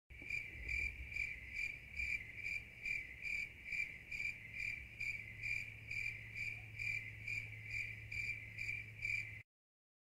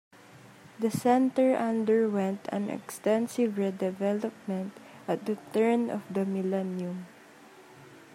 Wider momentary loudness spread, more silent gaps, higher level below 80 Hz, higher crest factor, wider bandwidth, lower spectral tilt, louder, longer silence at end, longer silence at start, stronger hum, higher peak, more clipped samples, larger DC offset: second, 3 LU vs 11 LU; neither; first, -60 dBFS vs -78 dBFS; about the same, 16 dB vs 18 dB; about the same, 16 kHz vs 16 kHz; second, -3 dB/octave vs -6.5 dB/octave; second, -43 LUFS vs -29 LUFS; first, 0.6 s vs 0 s; second, 0.1 s vs 0.35 s; neither; second, -30 dBFS vs -12 dBFS; neither; neither